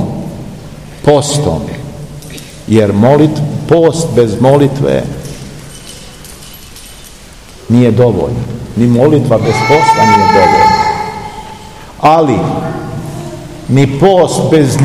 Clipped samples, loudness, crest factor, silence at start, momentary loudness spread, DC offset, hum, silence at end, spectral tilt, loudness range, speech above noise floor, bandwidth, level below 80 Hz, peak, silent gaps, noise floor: 2%; -9 LUFS; 10 dB; 0 s; 22 LU; 0.7%; none; 0 s; -6 dB/octave; 6 LU; 25 dB; 15.5 kHz; -36 dBFS; 0 dBFS; none; -33 dBFS